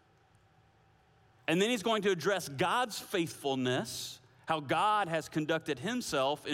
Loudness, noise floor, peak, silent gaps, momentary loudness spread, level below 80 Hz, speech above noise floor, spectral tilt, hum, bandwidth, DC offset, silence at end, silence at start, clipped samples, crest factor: -32 LUFS; -66 dBFS; -16 dBFS; none; 7 LU; -72 dBFS; 34 dB; -4 dB/octave; none; 16.5 kHz; under 0.1%; 0 s; 1.5 s; under 0.1%; 18 dB